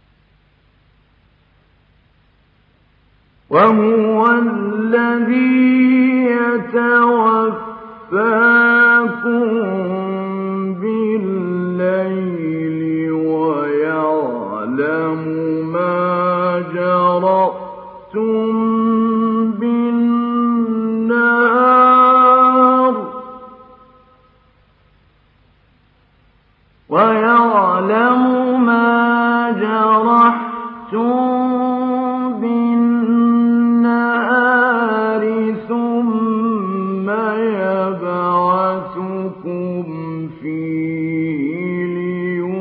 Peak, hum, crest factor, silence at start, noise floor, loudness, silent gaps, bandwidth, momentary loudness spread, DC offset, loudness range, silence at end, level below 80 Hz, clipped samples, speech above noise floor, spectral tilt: 0 dBFS; none; 14 dB; 3.5 s; -55 dBFS; -15 LUFS; none; 4.6 kHz; 11 LU; under 0.1%; 7 LU; 0 s; -64 dBFS; under 0.1%; 42 dB; -10 dB/octave